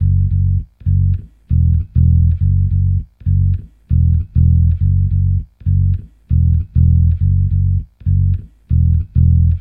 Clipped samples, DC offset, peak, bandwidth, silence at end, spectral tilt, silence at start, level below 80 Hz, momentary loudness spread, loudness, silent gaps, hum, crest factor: under 0.1%; under 0.1%; -2 dBFS; 0.5 kHz; 0 s; -13.5 dB/octave; 0 s; -20 dBFS; 7 LU; -15 LUFS; none; none; 12 dB